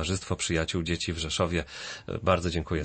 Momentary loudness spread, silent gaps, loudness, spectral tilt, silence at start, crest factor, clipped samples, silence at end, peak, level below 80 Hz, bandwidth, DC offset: 8 LU; none; -29 LUFS; -4.5 dB/octave; 0 s; 20 dB; under 0.1%; 0 s; -10 dBFS; -44 dBFS; 8.8 kHz; under 0.1%